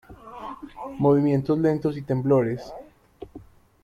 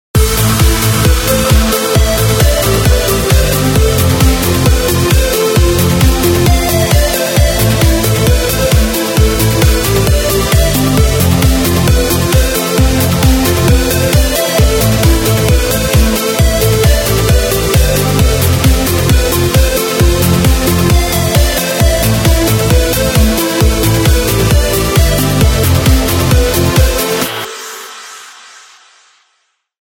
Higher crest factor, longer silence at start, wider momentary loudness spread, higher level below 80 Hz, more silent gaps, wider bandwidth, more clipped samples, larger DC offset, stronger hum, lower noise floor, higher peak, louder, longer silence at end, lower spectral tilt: first, 16 dB vs 10 dB; about the same, 0.1 s vs 0.15 s; first, 23 LU vs 1 LU; second, -54 dBFS vs -14 dBFS; neither; second, 7.2 kHz vs 18.5 kHz; neither; neither; neither; second, -47 dBFS vs -61 dBFS; second, -8 dBFS vs 0 dBFS; second, -23 LUFS vs -10 LUFS; second, 0.4 s vs 1.5 s; first, -9.5 dB/octave vs -4.5 dB/octave